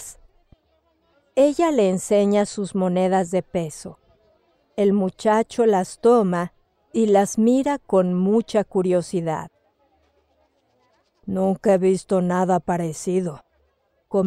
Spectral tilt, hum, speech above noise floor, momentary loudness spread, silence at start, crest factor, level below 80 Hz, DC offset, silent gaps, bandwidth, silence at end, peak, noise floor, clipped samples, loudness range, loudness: -6.5 dB/octave; none; 47 dB; 11 LU; 0 s; 16 dB; -58 dBFS; under 0.1%; none; 13.5 kHz; 0 s; -6 dBFS; -66 dBFS; under 0.1%; 5 LU; -21 LUFS